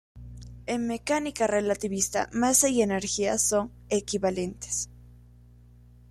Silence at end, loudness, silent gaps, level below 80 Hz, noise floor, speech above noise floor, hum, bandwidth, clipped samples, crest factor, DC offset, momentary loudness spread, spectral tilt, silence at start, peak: 1.1 s; -26 LUFS; none; -52 dBFS; -53 dBFS; 26 dB; 60 Hz at -50 dBFS; 15.5 kHz; under 0.1%; 20 dB; under 0.1%; 12 LU; -3 dB/octave; 0.15 s; -8 dBFS